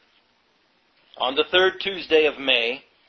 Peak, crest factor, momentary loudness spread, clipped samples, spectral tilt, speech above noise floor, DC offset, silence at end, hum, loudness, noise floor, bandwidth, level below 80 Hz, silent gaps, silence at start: -4 dBFS; 20 dB; 8 LU; under 0.1%; -4 dB/octave; 43 dB; under 0.1%; 0.3 s; none; -21 LUFS; -64 dBFS; 6.4 kHz; -60 dBFS; none; 1.2 s